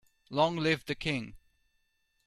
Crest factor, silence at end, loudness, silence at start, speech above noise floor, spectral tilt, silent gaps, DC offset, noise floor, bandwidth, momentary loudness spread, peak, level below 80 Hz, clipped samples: 20 dB; 0.9 s; -31 LUFS; 0.3 s; 45 dB; -5.5 dB/octave; none; under 0.1%; -76 dBFS; 13.5 kHz; 9 LU; -14 dBFS; -60 dBFS; under 0.1%